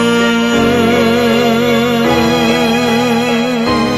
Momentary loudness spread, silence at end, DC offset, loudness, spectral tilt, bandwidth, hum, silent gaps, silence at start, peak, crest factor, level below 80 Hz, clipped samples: 2 LU; 0 s; 0.3%; -12 LUFS; -5 dB/octave; 13.5 kHz; none; none; 0 s; 0 dBFS; 12 dB; -40 dBFS; under 0.1%